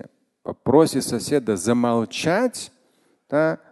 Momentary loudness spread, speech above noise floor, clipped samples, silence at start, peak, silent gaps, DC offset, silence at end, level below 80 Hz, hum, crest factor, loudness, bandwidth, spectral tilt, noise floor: 17 LU; 43 dB; under 0.1%; 0.05 s; -2 dBFS; none; under 0.1%; 0.15 s; -56 dBFS; none; 20 dB; -21 LUFS; 12.5 kHz; -5 dB/octave; -63 dBFS